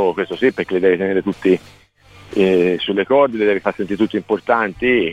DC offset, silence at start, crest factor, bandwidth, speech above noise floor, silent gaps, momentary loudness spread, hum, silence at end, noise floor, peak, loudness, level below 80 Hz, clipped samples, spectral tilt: 0.1%; 0 s; 16 dB; 9.4 kHz; 28 dB; none; 5 LU; none; 0 s; -45 dBFS; -2 dBFS; -17 LUFS; -52 dBFS; under 0.1%; -7 dB/octave